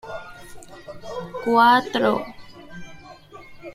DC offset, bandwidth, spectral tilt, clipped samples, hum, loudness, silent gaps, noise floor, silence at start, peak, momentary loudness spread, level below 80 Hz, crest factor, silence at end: under 0.1%; 15.5 kHz; -5 dB/octave; under 0.1%; none; -19 LUFS; none; -44 dBFS; 0.05 s; -4 dBFS; 27 LU; -54 dBFS; 20 dB; 0 s